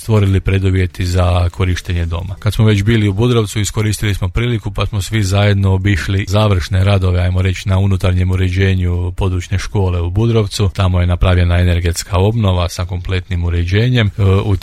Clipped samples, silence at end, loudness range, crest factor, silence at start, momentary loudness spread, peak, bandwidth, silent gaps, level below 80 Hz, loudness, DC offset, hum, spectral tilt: under 0.1%; 0 s; 1 LU; 12 dB; 0 s; 6 LU; 0 dBFS; 13.5 kHz; none; -28 dBFS; -15 LUFS; under 0.1%; none; -6 dB/octave